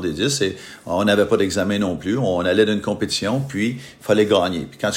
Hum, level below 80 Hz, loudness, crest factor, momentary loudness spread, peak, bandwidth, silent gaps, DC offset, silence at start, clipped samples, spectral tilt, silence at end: none; -54 dBFS; -20 LUFS; 18 dB; 8 LU; -2 dBFS; 16 kHz; none; under 0.1%; 0 s; under 0.1%; -4.5 dB/octave; 0 s